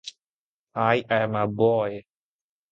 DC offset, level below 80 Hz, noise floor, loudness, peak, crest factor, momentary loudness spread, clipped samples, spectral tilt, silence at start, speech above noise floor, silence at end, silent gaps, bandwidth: under 0.1%; -64 dBFS; under -90 dBFS; -24 LUFS; -4 dBFS; 22 dB; 16 LU; under 0.1%; -6.5 dB/octave; 0.05 s; over 67 dB; 0.7 s; 0.24-0.67 s; 8.4 kHz